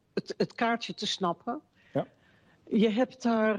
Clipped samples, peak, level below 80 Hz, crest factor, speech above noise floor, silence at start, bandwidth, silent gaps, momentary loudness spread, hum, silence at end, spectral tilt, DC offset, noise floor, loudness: under 0.1%; -14 dBFS; -72 dBFS; 16 dB; 34 dB; 0.15 s; 10 kHz; none; 11 LU; none; 0 s; -5 dB/octave; under 0.1%; -63 dBFS; -30 LUFS